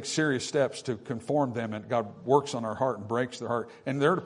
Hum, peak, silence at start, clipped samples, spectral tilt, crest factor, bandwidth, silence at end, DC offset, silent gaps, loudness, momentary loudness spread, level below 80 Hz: none; -8 dBFS; 0 s; under 0.1%; -5 dB/octave; 20 dB; 11 kHz; 0 s; under 0.1%; none; -29 LUFS; 8 LU; -70 dBFS